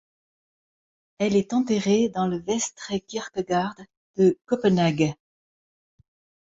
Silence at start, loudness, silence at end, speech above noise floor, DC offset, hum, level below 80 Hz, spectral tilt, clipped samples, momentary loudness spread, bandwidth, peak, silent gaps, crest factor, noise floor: 1.2 s; -24 LUFS; 1.45 s; over 67 dB; under 0.1%; none; -62 dBFS; -5.5 dB/octave; under 0.1%; 10 LU; 8 kHz; -8 dBFS; 3.97-4.14 s; 18 dB; under -90 dBFS